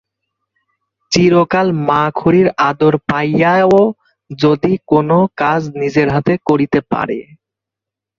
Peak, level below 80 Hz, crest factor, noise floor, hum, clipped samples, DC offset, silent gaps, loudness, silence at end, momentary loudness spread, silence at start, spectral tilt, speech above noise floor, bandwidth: 0 dBFS; -48 dBFS; 14 dB; -84 dBFS; none; under 0.1%; under 0.1%; none; -13 LUFS; 0.95 s; 6 LU; 1.1 s; -6.5 dB/octave; 72 dB; 7.6 kHz